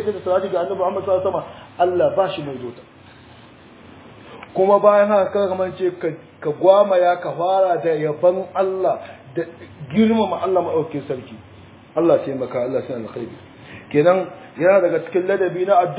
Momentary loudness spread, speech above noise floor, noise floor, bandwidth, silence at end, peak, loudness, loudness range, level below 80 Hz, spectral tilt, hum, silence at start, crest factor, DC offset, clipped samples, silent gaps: 15 LU; 26 dB; -44 dBFS; 4 kHz; 0 s; 0 dBFS; -19 LUFS; 6 LU; -58 dBFS; -10.5 dB/octave; none; 0 s; 18 dB; under 0.1%; under 0.1%; none